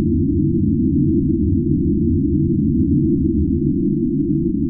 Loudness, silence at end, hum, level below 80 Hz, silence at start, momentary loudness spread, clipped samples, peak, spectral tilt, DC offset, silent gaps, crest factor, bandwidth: -17 LUFS; 0 s; none; -30 dBFS; 0 s; 2 LU; under 0.1%; -4 dBFS; -18.5 dB/octave; under 0.1%; none; 12 dB; 0.4 kHz